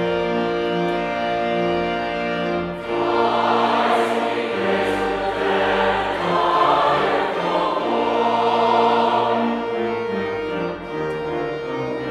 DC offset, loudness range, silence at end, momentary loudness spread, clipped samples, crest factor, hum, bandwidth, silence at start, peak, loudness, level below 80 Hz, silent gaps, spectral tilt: under 0.1%; 3 LU; 0 s; 8 LU; under 0.1%; 16 dB; none; 12.5 kHz; 0 s; -4 dBFS; -20 LUFS; -50 dBFS; none; -5.5 dB/octave